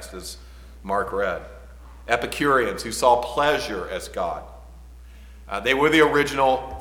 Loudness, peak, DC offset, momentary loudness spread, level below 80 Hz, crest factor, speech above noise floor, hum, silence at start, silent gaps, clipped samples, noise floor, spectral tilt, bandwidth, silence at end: -22 LUFS; -4 dBFS; under 0.1%; 18 LU; -42 dBFS; 20 dB; 21 dB; none; 0 s; none; under 0.1%; -43 dBFS; -4 dB/octave; 18.5 kHz; 0 s